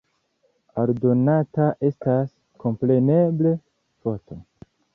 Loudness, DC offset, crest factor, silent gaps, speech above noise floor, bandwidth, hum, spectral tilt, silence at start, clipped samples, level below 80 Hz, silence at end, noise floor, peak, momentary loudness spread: -22 LUFS; under 0.1%; 16 dB; none; 47 dB; 3.8 kHz; none; -12.5 dB/octave; 0.75 s; under 0.1%; -60 dBFS; 0.55 s; -68 dBFS; -6 dBFS; 14 LU